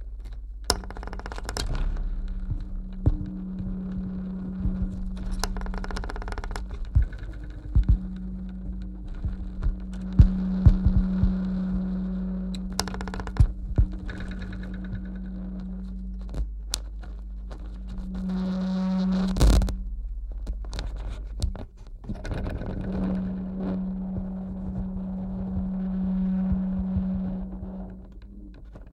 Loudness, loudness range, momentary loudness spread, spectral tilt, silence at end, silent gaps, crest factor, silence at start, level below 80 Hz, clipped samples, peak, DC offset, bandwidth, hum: -30 LUFS; 8 LU; 14 LU; -6.5 dB/octave; 0 s; none; 26 dB; 0 s; -30 dBFS; under 0.1%; 0 dBFS; under 0.1%; 14.5 kHz; none